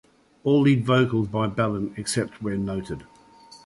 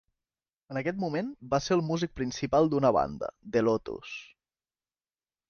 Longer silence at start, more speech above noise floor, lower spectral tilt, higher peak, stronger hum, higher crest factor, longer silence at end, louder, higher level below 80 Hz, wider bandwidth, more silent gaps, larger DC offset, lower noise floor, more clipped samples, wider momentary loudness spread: second, 0.45 s vs 0.7 s; second, 27 dB vs over 61 dB; about the same, -6 dB/octave vs -6 dB/octave; first, -6 dBFS vs -12 dBFS; neither; about the same, 18 dB vs 18 dB; second, 0.1 s vs 1.25 s; first, -24 LUFS vs -29 LUFS; about the same, -52 dBFS vs -56 dBFS; first, 11.5 kHz vs 7 kHz; neither; neither; second, -50 dBFS vs under -90 dBFS; neither; about the same, 12 LU vs 14 LU